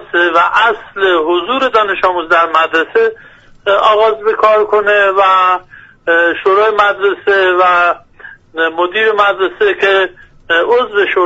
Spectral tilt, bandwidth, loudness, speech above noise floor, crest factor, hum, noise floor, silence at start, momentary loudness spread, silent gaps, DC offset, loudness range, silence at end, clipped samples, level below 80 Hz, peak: -4 dB/octave; 8 kHz; -11 LUFS; 25 dB; 12 dB; none; -36 dBFS; 0 s; 6 LU; none; under 0.1%; 2 LU; 0 s; under 0.1%; -50 dBFS; 0 dBFS